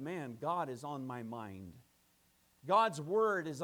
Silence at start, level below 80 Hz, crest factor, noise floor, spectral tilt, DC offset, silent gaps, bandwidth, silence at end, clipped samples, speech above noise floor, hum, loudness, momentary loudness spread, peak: 0 s; -78 dBFS; 20 dB; -72 dBFS; -5.5 dB/octave; under 0.1%; none; 19.5 kHz; 0 s; under 0.1%; 36 dB; none; -36 LUFS; 19 LU; -18 dBFS